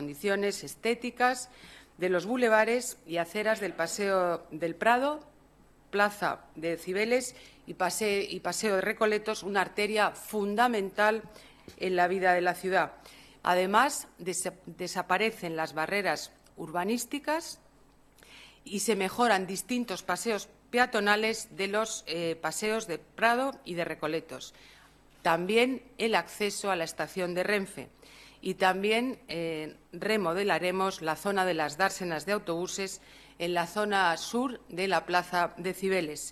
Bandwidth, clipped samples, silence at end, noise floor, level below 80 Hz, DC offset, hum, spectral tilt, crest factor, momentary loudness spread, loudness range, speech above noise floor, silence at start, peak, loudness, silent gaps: 14.5 kHz; under 0.1%; 0 s; -60 dBFS; -66 dBFS; under 0.1%; none; -3.5 dB/octave; 22 dB; 10 LU; 3 LU; 30 dB; 0 s; -8 dBFS; -30 LUFS; none